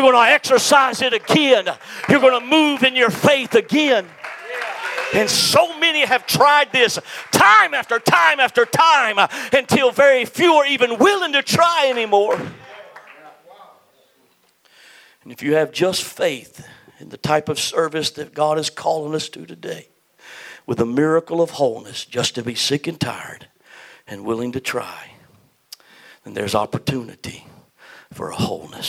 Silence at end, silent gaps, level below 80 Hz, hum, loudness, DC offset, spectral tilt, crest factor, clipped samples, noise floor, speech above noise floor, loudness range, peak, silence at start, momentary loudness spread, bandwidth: 0 s; none; -62 dBFS; none; -16 LUFS; under 0.1%; -3.5 dB/octave; 18 dB; under 0.1%; -59 dBFS; 42 dB; 13 LU; 0 dBFS; 0 s; 17 LU; 16.5 kHz